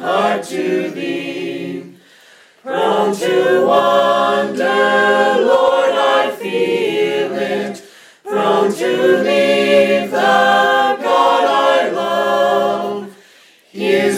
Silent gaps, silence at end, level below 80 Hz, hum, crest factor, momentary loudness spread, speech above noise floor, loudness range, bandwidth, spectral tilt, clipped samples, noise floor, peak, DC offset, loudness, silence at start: none; 0 s; -64 dBFS; none; 12 dB; 12 LU; 27 dB; 4 LU; 16 kHz; -4 dB/octave; under 0.1%; -47 dBFS; -2 dBFS; under 0.1%; -14 LUFS; 0 s